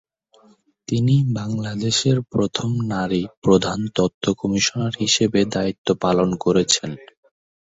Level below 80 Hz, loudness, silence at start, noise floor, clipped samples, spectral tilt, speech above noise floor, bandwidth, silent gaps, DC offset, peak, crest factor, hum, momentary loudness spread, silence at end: -50 dBFS; -20 LUFS; 0.9 s; -56 dBFS; under 0.1%; -5 dB/octave; 36 dB; 8.4 kHz; 3.37-3.42 s, 4.14-4.21 s, 5.78-5.85 s; under 0.1%; -2 dBFS; 18 dB; none; 6 LU; 0.6 s